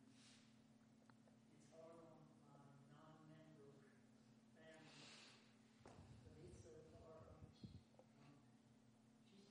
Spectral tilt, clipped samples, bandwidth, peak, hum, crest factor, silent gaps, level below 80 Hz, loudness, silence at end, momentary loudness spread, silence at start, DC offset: -5 dB/octave; under 0.1%; 10 kHz; -46 dBFS; none; 20 dB; none; -82 dBFS; -66 LUFS; 0 s; 6 LU; 0 s; under 0.1%